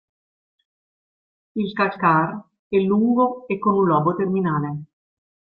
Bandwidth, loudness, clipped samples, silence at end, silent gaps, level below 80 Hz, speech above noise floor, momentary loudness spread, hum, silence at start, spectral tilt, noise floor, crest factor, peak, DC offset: 5 kHz; -20 LUFS; under 0.1%; 0.7 s; 2.59-2.71 s; -62 dBFS; over 70 dB; 11 LU; none; 1.55 s; -11 dB/octave; under -90 dBFS; 18 dB; -4 dBFS; under 0.1%